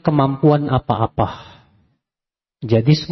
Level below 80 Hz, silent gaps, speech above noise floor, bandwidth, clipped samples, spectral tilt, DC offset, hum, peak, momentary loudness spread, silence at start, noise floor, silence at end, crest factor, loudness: -44 dBFS; none; 73 dB; 6.2 kHz; under 0.1%; -8.5 dB/octave; under 0.1%; none; -2 dBFS; 11 LU; 0.05 s; -89 dBFS; 0.05 s; 18 dB; -17 LUFS